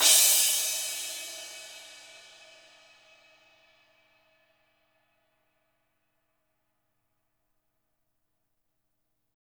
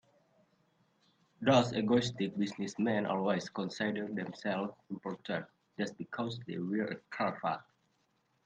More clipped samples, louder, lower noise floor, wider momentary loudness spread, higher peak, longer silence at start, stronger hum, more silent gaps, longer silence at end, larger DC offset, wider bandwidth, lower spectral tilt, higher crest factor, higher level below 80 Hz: neither; first, -23 LUFS vs -35 LUFS; first, -80 dBFS vs -76 dBFS; first, 28 LU vs 11 LU; first, -6 dBFS vs -14 dBFS; second, 0 s vs 1.4 s; neither; neither; first, 7.65 s vs 0.85 s; neither; first, over 20 kHz vs 9 kHz; second, 3.5 dB/octave vs -6 dB/octave; about the same, 26 dB vs 22 dB; second, -82 dBFS vs -72 dBFS